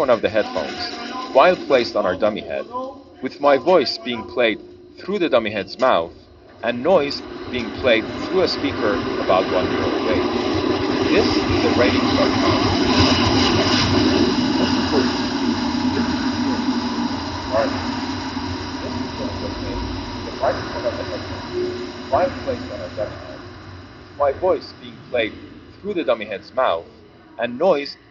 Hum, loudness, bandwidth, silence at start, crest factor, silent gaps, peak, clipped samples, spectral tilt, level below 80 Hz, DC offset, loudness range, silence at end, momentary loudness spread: none; -20 LUFS; 7.4 kHz; 0 s; 18 dB; none; -2 dBFS; under 0.1%; -3.5 dB/octave; -44 dBFS; under 0.1%; 9 LU; 0.15 s; 12 LU